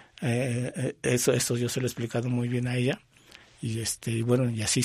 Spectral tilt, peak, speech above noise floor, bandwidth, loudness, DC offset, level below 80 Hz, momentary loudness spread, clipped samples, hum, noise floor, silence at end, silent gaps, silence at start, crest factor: -5 dB/octave; -10 dBFS; 27 dB; 15.5 kHz; -28 LUFS; under 0.1%; -60 dBFS; 6 LU; under 0.1%; none; -54 dBFS; 0 s; none; 0.2 s; 18 dB